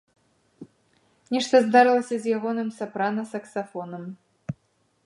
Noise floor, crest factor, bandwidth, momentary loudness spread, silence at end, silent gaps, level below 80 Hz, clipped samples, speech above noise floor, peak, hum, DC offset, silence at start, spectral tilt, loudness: -68 dBFS; 22 dB; 11.5 kHz; 20 LU; 0.55 s; none; -70 dBFS; under 0.1%; 45 dB; -4 dBFS; none; under 0.1%; 0.6 s; -5 dB/octave; -23 LUFS